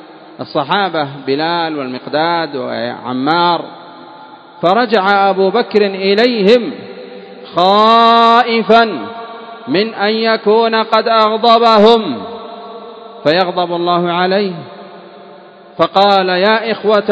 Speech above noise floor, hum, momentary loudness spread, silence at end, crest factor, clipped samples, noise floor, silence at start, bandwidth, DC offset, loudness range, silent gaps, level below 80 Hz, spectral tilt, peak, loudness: 26 dB; none; 20 LU; 0 s; 14 dB; 0.3%; -37 dBFS; 0.1 s; 8 kHz; under 0.1%; 6 LU; none; -64 dBFS; -6 dB/octave; 0 dBFS; -12 LUFS